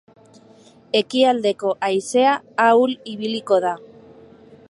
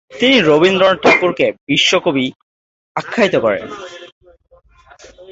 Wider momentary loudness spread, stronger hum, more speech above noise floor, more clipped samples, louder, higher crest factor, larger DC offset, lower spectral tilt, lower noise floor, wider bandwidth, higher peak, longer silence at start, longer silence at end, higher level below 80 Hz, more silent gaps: second, 10 LU vs 16 LU; neither; about the same, 31 dB vs 33 dB; neither; second, -19 LUFS vs -13 LUFS; about the same, 18 dB vs 16 dB; neither; about the same, -4 dB/octave vs -4 dB/octave; about the same, -49 dBFS vs -46 dBFS; first, 11.5 kHz vs 8 kHz; about the same, -2 dBFS vs 0 dBFS; first, 0.95 s vs 0.1 s; first, 0.9 s vs 0 s; second, -72 dBFS vs -54 dBFS; second, none vs 1.61-1.67 s, 2.36-2.95 s, 4.12-4.21 s